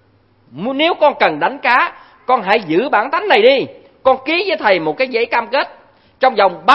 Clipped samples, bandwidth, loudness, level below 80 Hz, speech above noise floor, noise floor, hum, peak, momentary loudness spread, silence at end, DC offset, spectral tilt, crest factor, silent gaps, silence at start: under 0.1%; 6 kHz; -14 LUFS; -60 dBFS; 39 dB; -53 dBFS; none; 0 dBFS; 7 LU; 0 s; under 0.1%; -5.5 dB/octave; 14 dB; none; 0.55 s